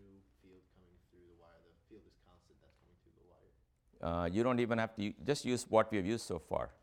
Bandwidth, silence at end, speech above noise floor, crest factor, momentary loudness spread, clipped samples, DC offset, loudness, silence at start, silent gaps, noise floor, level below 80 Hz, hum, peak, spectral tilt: 16.5 kHz; 0.1 s; 36 dB; 24 dB; 8 LU; under 0.1%; under 0.1%; -36 LUFS; 1.9 s; none; -71 dBFS; -62 dBFS; none; -14 dBFS; -5.5 dB/octave